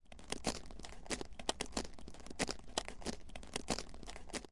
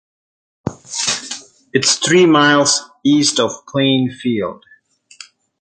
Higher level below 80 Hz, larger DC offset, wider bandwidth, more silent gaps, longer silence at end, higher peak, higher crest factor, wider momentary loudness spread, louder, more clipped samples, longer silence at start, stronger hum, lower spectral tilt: about the same, -54 dBFS vs -56 dBFS; neither; first, 11.5 kHz vs 9.6 kHz; neither; second, 0 s vs 1.05 s; second, -18 dBFS vs 0 dBFS; first, 26 dB vs 16 dB; second, 12 LU vs 18 LU; second, -44 LUFS vs -14 LUFS; neither; second, 0.05 s vs 0.65 s; neither; about the same, -2.5 dB/octave vs -3 dB/octave